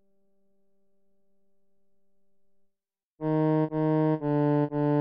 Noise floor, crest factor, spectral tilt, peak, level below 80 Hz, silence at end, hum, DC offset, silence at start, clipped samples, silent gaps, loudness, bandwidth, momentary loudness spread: -82 dBFS; 14 dB; -12 dB/octave; -16 dBFS; -64 dBFS; 0 s; none; under 0.1%; 3.2 s; under 0.1%; none; -26 LUFS; 4.9 kHz; 3 LU